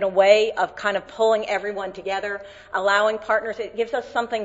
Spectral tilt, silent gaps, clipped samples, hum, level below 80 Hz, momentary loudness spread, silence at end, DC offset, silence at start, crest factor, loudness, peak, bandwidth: -3 dB/octave; none; under 0.1%; none; -60 dBFS; 13 LU; 0 s; under 0.1%; 0 s; 20 dB; -22 LUFS; -2 dBFS; 8 kHz